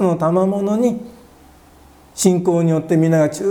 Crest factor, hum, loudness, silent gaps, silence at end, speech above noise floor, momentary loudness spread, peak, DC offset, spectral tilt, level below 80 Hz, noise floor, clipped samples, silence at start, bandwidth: 16 dB; none; -17 LUFS; none; 0 s; 30 dB; 5 LU; 0 dBFS; under 0.1%; -6.5 dB/octave; -52 dBFS; -46 dBFS; under 0.1%; 0 s; 18 kHz